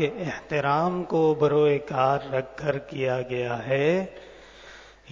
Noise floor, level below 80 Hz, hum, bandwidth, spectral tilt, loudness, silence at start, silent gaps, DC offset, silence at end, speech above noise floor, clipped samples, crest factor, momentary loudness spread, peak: -48 dBFS; -58 dBFS; none; 7.4 kHz; -7 dB/octave; -25 LUFS; 0 s; none; under 0.1%; 0 s; 23 dB; under 0.1%; 16 dB; 11 LU; -8 dBFS